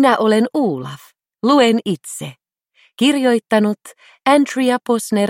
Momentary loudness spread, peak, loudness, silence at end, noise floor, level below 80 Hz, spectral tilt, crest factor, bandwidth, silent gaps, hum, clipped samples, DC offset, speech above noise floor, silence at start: 16 LU; 0 dBFS; -16 LUFS; 0 s; -57 dBFS; -68 dBFS; -4.5 dB/octave; 16 dB; 16.5 kHz; none; none; under 0.1%; under 0.1%; 41 dB; 0 s